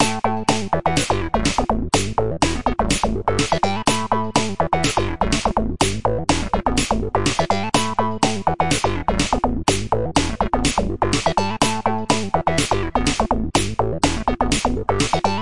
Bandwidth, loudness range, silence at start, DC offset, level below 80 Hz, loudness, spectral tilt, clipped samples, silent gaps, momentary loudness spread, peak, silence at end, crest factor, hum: 11.5 kHz; 0 LU; 0 s; 3%; -32 dBFS; -20 LUFS; -4 dB/octave; under 0.1%; none; 2 LU; -2 dBFS; 0 s; 18 dB; none